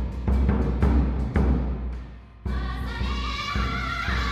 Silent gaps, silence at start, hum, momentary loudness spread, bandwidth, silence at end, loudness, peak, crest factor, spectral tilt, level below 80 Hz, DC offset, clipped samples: none; 0 s; none; 11 LU; 7.4 kHz; 0 s; -26 LUFS; -10 dBFS; 16 dB; -7 dB/octave; -26 dBFS; under 0.1%; under 0.1%